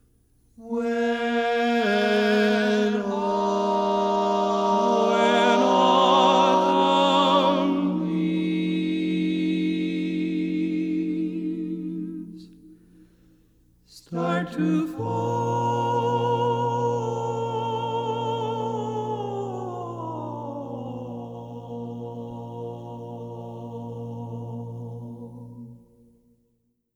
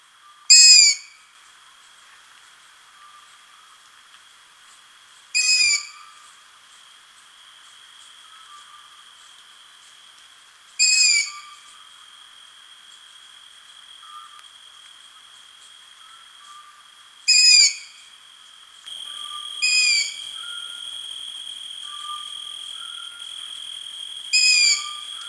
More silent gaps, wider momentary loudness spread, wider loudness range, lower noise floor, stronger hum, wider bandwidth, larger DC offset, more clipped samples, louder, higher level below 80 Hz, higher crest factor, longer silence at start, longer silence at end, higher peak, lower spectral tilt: neither; second, 17 LU vs 23 LU; about the same, 16 LU vs 14 LU; first, -71 dBFS vs -50 dBFS; neither; about the same, 12.5 kHz vs 12 kHz; neither; neither; second, -23 LUFS vs -15 LUFS; first, -62 dBFS vs -78 dBFS; second, 18 dB vs 24 dB; about the same, 0.6 s vs 0.5 s; first, 1.2 s vs 0 s; second, -6 dBFS vs 0 dBFS; first, -6 dB/octave vs 6.5 dB/octave